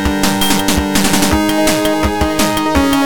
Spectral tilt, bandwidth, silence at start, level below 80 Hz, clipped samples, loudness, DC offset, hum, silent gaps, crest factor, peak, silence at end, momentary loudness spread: -4 dB/octave; 17.5 kHz; 0 s; -26 dBFS; under 0.1%; -13 LUFS; under 0.1%; none; none; 12 dB; 0 dBFS; 0 s; 2 LU